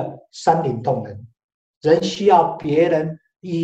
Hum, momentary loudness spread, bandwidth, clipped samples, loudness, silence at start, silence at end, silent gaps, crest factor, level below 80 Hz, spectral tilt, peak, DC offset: none; 15 LU; 8.6 kHz; under 0.1%; -19 LUFS; 0 s; 0 s; 1.44-1.81 s; 18 dB; -58 dBFS; -6.5 dB/octave; -2 dBFS; under 0.1%